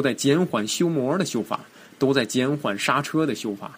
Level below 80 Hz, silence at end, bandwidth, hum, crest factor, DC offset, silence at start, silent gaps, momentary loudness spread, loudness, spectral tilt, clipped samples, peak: -66 dBFS; 0 s; 15.5 kHz; none; 18 dB; under 0.1%; 0 s; none; 7 LU; -23 LUFS; -4.5 dB/octave; under 0.1%; -4 dBFS